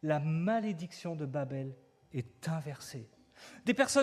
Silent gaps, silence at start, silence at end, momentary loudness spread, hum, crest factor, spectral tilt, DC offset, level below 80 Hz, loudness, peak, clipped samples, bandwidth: none; 0.05 s; 0 s; 19 LU; none; 22 dB; -5.5 dB/octave; under 0.1%; -76 dBFS; -36 LUFS; -14 dBFS; under 0.1%; 14.5 kHz